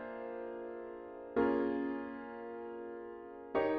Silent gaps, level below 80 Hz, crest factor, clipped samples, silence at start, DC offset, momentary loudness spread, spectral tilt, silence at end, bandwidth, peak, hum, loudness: none; -68 dBFS; 18 dB; under 0.1%; 0 s; under 0.1%; 14 LU; -4.5 dB/octave; 0 s; 5.2 kHz; -20 dBFS; none; -40 LUFS